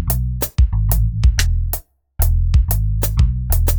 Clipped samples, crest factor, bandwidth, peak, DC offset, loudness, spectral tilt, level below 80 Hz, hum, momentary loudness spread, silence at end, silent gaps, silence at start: under 0.1%; 16 dB; over 20 kHz; 0 dBFS; under 0.1%; -18 LUFS; -5 dB/octave; -18 dBFS; none; 5 LU; 0 s; none; 0 s